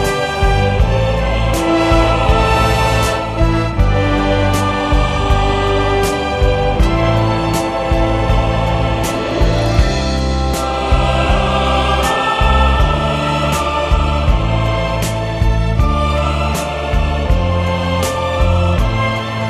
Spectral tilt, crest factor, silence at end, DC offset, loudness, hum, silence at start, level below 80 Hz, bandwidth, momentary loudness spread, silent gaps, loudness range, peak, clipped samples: -5.5 dB/octave; 14 dB; 0 s; under 0.1%; -15 LUFS; none; 0 s; -18 dBFS; 14 kHz; 4 LU; none; 2 LU; 0 dBFS; under 0.1%